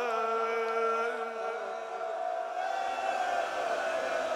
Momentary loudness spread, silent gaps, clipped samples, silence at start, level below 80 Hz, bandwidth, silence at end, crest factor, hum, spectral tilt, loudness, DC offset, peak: 6 LU; none; under 0.1%; 0 s; -78 dBFS; 13.5 kHz; 0 s; 14 dB; none; -2 dB/octave; -32 LUFS; under 0.1%; -18 dBFS